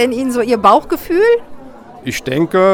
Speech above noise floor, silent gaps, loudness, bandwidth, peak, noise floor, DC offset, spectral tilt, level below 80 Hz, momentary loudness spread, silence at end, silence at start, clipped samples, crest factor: 21 dB; none; -14 LUFS; over 20 kHz; 0 dBFS; -34 dBFS; under 0.1%; -5.5 dB/octave; -42 dBFS; 11 LU; 0 s; 0 s; under 0.1%; 14 dB